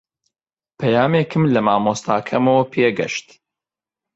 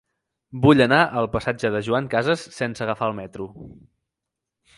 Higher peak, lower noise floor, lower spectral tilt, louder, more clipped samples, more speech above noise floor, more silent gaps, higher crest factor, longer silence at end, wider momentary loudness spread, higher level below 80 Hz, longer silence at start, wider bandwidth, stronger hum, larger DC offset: about the same, -2 dBFS vs -2 dBFS; first, -89 dBFS vs -84 dBFS; about the same, -6 dB/octave vs -6.5 dB/octave; first, -18 LUFS vs -21 LUFS; neither; first, 71 dB vs 63 dB; neither; second, 16 dB vs 22 dB; second, 0.95 s vs 1.1 s; second, 8 LU vs 19 LU; second, -58 dBFS vs -50 dBFS; first, 0.8 s vs 0.55 s; second, 8 kHz vs 11.5 kHz; neither; neither